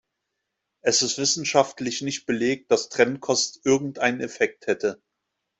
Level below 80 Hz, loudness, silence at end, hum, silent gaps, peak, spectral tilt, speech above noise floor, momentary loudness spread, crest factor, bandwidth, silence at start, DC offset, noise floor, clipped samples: -66 dBFS; -23 LUFS; 0.65 s; none; none; -4 dBFS; -2.5 dB/octave; 57 dB; 7 LU; 20 dB; 8.4 kHz; 0.85 s; under 0.1%; -81 dBFS; under 0.1%